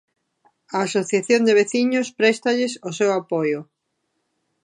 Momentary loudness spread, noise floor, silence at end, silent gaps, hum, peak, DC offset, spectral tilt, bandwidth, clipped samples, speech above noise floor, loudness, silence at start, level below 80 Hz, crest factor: 8 LU; -74 dBFS; 1 s; none; none; -2 dBFS; under 0.1%; -4 dB/octave; 11 kHz; under 0.1%; 55 dB; -20 LUFS; 0.7 s; -76 dBFS; 20 dB